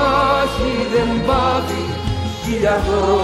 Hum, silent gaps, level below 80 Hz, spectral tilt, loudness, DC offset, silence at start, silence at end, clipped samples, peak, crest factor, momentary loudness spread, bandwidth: none; none; -30 dBFS; -5.5 dB/octave; -18 LUFS; under 0.1%; 0 s; 0 s; under 0.1%; -4 dBFS; 14 dB; 7 LU; 15.5 kHz